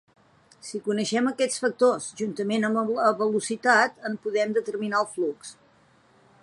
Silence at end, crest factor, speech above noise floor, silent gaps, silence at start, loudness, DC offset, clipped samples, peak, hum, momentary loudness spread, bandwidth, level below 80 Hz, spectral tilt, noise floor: 0.9 s; 20 dB; 35 dB; none; 0.65 s; -25 LUFS; under 0.1%; under 0.1%; -6 dBFS; none; 11 LU; 11.5 kHz; -76 dBFS; -4 dB/octave; -60 dBFS